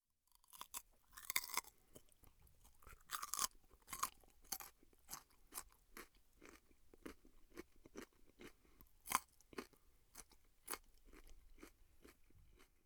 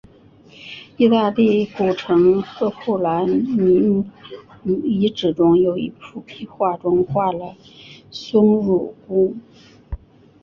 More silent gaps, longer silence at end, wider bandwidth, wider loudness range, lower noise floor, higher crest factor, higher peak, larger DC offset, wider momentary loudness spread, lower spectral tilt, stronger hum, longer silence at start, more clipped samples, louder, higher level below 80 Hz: neither; second, 0.2 s vs 0.45 s; first, over 20 kHz vs 6.8 kHz; first, 12 LU vs 3 LU; first, -77 dBFS vs -48 dBFS; first, 38 dB vs 16 dB; second, -16 dBFS vs -2 dBFS; neither; first, 25 LU vs 21 LU; second, -0.5 dB/octave vs -8 dB/octave; neither; about the same, 0.55 s vs 0.6 s; neither; second, -48 LUFS vs -18 LUFS; second, -70 dBFS vs -48 dBFS